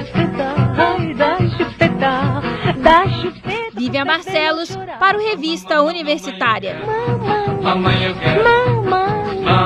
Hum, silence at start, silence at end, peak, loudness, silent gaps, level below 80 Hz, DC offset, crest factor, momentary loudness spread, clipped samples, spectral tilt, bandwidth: none; 0 s; 0 s; 0 dBFS; -16 LUFS; none; -40 dBFS; under 0.1%; 16 dB; 8 LU; under 0.1%; -6.5 dB/octave; 11 kHz